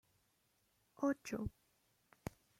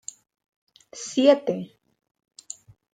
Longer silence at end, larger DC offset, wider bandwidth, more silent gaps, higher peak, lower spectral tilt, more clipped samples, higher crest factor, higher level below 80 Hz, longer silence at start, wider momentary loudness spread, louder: second, 1.1 s vs 1.3 s; neither; first, 16 kHz vs 9.6 kHz; neither; second, -24 dBFS vs -4 dBFS; first, -6 dB/octave vs -4 dB/octave; neither; about the same, 22 dB vs 22 dB; first, -64 dBFS vs -74 dBFS; about the same, 1 s vs 0.95 s; second, 14 LU vs 23 LU; second, -43 LUFS vs -22 LUFS